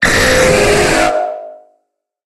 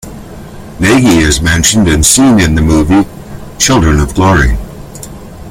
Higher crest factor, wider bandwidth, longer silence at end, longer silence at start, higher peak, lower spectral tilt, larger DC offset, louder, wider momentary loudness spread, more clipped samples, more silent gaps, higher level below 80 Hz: about the same, 12 dB vs 10 dB; second, 16.5 kHz vs over 20 kHz; first, 0.75 s vs 0 s; about the same, 0 s vs 0.05 s; about the same, 0 dBFS vs 0 dBFS; about the same, -3 dB/octave vs -4 dB/octave; neither; second, -11 LUFS vs -8 LUFS; second, 12 LU vs 22 LU; second, under 0.1% vs 0.1%; neither; second, -28 dBFS vs -20 dBFS